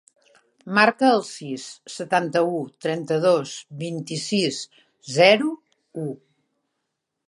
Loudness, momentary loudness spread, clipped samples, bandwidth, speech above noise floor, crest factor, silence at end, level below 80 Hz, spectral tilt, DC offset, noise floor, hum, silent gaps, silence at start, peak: -22 LUFS; 18 LU; under 0.1%; 11.5 kHz; 58 dB; 22 dB; 1.1 s; -76 dBFS; -4.5 dB/octave; under 0.1%; -80 dBFS; none; none; 0.65 s; -2 dBFS